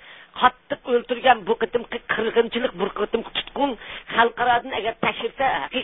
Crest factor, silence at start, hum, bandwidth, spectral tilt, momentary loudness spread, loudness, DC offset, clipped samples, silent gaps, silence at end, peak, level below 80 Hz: 22 dB; 0.05 s; none; 4 kHz; -8.5 dB/octave; 8 LU; -23 LUFS; 0.1%; under 0.1%; none; 0 s; -2 dBFS; -54 dBFS